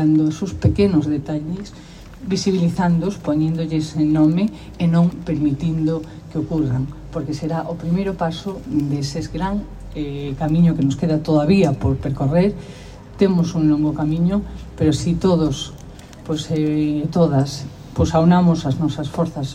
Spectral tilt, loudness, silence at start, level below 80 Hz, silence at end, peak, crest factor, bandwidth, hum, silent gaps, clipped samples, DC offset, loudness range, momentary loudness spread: -7.5 dB/octave; -19 LUFS; 0 s; -38 dBFS; 0 s; -4 dBFS; 14 dB; 10.5 kHz; none; none; under 0.1%; under 0.1%; 5 LU; 12 LU